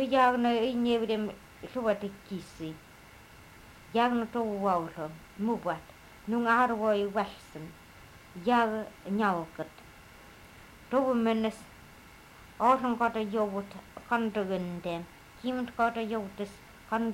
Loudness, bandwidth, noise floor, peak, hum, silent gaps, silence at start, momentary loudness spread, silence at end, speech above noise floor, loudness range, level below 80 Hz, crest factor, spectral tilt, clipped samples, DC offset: -30 LUFS; 16 kHz; -53 dBFS; -12 dBFS; none; none; 0 s; 20 LU; 0 s; 23 dB; 4 LU; -60 dBFS; 18 dB; -6 dB/octave; under 0.1%; under 0.1%